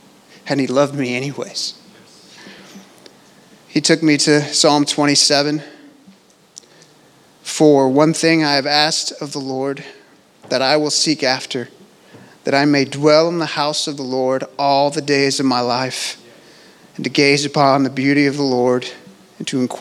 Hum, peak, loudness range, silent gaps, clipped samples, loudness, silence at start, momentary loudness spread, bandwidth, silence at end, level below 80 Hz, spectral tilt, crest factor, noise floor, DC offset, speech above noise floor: none; 0 dBFS; 4 LU; none; under 0.1%; -16 LUFS; 0.45 s; 13 LU; 14 kHz; 0 s; -72 dBFS; -3.5 dB/octave; 18 dB; -49 dBFS; under 0.1%; 34 dB